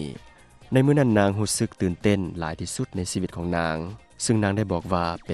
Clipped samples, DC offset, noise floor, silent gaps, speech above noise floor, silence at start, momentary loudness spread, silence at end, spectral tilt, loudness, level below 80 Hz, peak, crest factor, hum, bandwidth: under 0.1%; under 0.1%; -50 dBFS; none; 26 dB; 0 s; 11 LU; 0 s; -5.5 dB/octave; -24 LUFS; -48 dBFS; -6 dBFS; 18 dB; none; 13 kHz